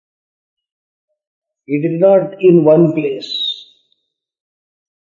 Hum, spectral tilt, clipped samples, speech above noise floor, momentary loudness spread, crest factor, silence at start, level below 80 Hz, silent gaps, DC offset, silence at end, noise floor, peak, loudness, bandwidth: none; -8 dB/octave; under 0.1%; 55 dB; 11 LU; 16 dB; 1.7 s; -70 dBFS; none; under 0.1%; 1.45 s; -67 dBFS; 0 dBFS; -13 LUFS; 7.2 kHz